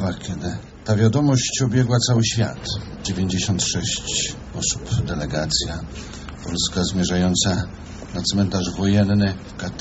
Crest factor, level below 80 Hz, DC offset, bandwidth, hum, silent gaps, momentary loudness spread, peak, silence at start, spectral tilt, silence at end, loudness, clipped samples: 18 dB; -38 dBFS; under 0.1%; 8.2 kHz; none; none; 13 LU; -4 dBFS; 0 s; -4.5 dB/octave; 0 s; -21 LUFS; under 0.1%